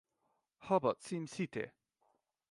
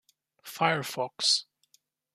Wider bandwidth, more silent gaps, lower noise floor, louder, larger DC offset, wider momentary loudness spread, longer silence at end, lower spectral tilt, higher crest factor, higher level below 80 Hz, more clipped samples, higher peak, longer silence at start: second, 11.5 kHz vs 15.5 kHz; neither; first, -82 dBFS vs -69 dBFS; second, -38 LUFS vs -27 LUFS; neither; second, 13 LU vs 18 LU; about the same, 0.8 s vs 0.75 s; first, -6 dB/octave vs -2 dB/octave; about the same, 22 dB vs 24 dB; about the same, -78 dBFS vs -80 dBFS; neither; second, -18 dBFS vs -8 dBFS; first, 0.6 s vs 0.45 s